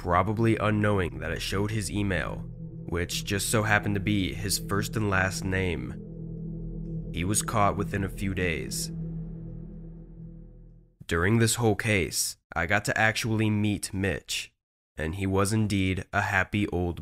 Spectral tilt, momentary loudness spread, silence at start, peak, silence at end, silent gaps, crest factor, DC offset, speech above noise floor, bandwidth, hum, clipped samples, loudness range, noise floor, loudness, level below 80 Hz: -4.5 dB/octave; 15 LU; 0 s; -6 dBFS; 0 s; 12.44-12.50 s, 14.63-14.95 s; 22 dB; under 0.1%; 24 dB; 16 kHz; none; under 0.1%; 4 LU; -51 dBFS; -27 LUFS; -44 dBFS